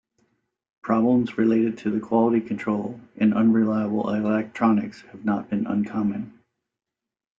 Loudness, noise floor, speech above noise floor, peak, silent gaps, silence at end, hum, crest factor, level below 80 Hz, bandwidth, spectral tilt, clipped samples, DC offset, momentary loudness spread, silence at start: -23 LUFS; -88 dBFS; 65 dB; -6 dBFS; none; 1.1 s; none; 16 dB; -64 dBFS; 7.2 kHz; -9 dB/octave; under 0.1%; under 0.1%; 9 LU; 0.85 s